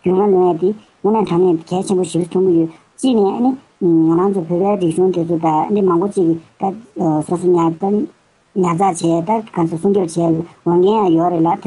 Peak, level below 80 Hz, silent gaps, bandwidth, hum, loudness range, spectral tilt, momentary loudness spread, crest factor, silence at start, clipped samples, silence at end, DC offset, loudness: -4 dBFS; -58 dBFS; none; 11.5 kHz; none; 2 LU; -7.5 dB/octave; 7 LU; 10 dB; 0.05 s; under 0.1%; 0 s; under 0.1%; -16 LUFS